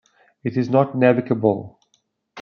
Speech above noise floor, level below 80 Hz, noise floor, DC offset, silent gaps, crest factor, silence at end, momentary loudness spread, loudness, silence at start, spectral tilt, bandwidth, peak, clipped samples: 49 dB; -68 dBFS; -67 dBFS; under 0.1%; none; 18 dB; 0 s; 11 LU; -20 LUFS; 0.45 s; -9 dB/octave; 6.6 kHz; -2 dBFS; under 0.1%